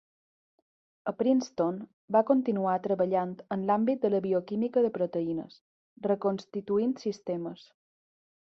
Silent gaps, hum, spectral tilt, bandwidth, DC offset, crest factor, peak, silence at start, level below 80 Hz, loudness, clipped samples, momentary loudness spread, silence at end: 1.93-2.08 s, 5.61-5.96 s; none; -7.5 dB/octave; 7 kHz; under 0.1%; 20 dB; -10 dBFS; 1.05 s; -74 dBFS; -29 LUFS; under 0.1%; 10 LU; 0.95 s